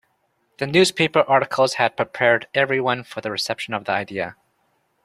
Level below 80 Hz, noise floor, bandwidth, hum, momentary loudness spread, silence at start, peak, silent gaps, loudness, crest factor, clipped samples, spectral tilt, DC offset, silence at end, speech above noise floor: -62 dBFS; -68 dBFS; 14 kHz; none; 10 LU; 0.6 s; -2 dBFS; none; -20 LUFS; 20 dB; under 0.1%; -4 dB/octave; under 0.1%; 0.7 s; 47 dB